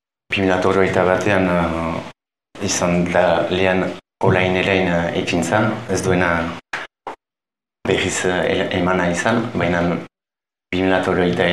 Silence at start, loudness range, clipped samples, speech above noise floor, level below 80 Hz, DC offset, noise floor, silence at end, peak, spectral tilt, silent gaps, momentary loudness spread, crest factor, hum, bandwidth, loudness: 0.3 s; 3 LU; under 0.1%; over 73 dB; -46 dBFS; 0.3%; under -90 dBFS; 0 s; 0 dBFS; -5 dB/octave; none; 11 LU; 18 dB; none; 13 kHz; -18 LUFS